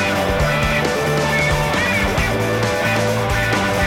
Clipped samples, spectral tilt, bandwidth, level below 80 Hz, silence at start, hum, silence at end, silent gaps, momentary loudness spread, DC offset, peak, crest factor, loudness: under 0.1%; -4.5 dB/octave; 16.5 kHz; -30 dBFS; 0 s; none; 0 s; none; 2 LU; 0.3%; -4 dBFS; 14 dB; -17 LUFS